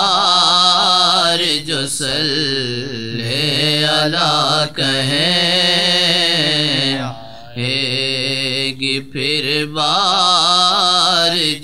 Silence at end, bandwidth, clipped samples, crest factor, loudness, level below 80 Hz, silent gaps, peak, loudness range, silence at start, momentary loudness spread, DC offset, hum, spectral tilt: 0 s; 15.5 kHz; under 0.1%; 16 dB; -14 LUFS; -52 dBFS; none; 0 dBFS; 4 LU; 0 s; 9 LU; 1%; none; -3 dB/octave